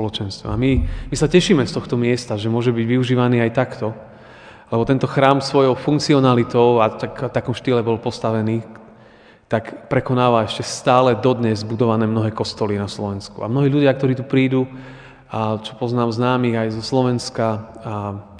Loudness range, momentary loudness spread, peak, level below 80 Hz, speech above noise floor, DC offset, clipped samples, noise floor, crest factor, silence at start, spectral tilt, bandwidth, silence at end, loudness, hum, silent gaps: 4 LU; 11 LU; 0 dBFS; -38 dBFS; 29 dB; under 0.1%; under 0.1%; -47 dBFS; 18 dB; 0 s; -6.5 dB/octave; 10 kHz; 0 s; -19 LUFS; none; none